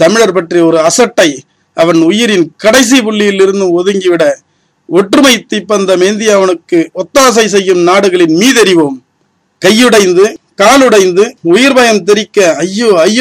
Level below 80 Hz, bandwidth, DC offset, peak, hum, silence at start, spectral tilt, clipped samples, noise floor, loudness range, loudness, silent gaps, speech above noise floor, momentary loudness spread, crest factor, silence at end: -48 dBFS; 16 kHz; under 0.1%; 0 dBFS; none; 0 s; -3.5 dB/octave; 2%; -57 dBFS; 2 LU; -7 LUFS; none; 50 dB; 7 LU; 8 dB; 0 s